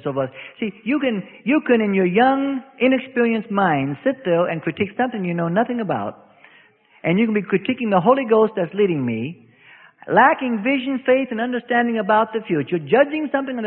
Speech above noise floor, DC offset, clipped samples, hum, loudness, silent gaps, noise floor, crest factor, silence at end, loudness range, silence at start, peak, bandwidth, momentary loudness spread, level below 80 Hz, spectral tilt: 34 dB; under 0.1%; under 0.1%; none; -20 LUFS; none; -53 dBFS; 18 dB; 0 s; 4 LU; 0.05 s; -2 dBFS; 4.2 kHz; 9 LU; -64 dBFS; -11.5 dB/octave